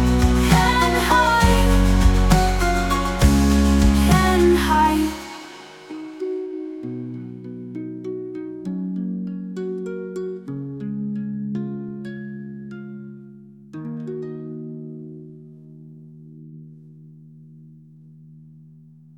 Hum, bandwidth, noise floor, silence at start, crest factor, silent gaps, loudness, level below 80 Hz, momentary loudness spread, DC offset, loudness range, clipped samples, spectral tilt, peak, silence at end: none; 18 kHz; -47 dBFS; 0 s; 20 dB; none; -20 LUFS; -26 dBFS; 20 LU; under 0.1%; 18 LU; under 0.1%; -5.5 dB/octave; -2 dBFS; 0.8 s